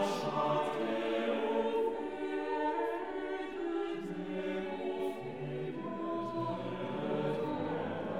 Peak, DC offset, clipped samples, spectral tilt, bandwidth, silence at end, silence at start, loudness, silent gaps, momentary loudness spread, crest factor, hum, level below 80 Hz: -20 dBFS; 0.2%; under 0.1%; -6.5 dB/octave; 15 kHz; 0 s; 0 s; -36 LUFS; none; 7 LU; 14 dB; none; -68 dBFS